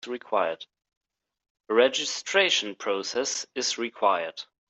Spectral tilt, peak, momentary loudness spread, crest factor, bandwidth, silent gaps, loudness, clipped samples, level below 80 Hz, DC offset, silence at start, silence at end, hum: -1 dB/octave; -8 dBFS; 8 LU; 20 dB; 8.4 kHz; 0.97-1.01 s, 1.50-1.55 s; -26 LUFS; under 0.1%; -78 dBFS; under 0.1%; 0.05 s; 0.25 s; none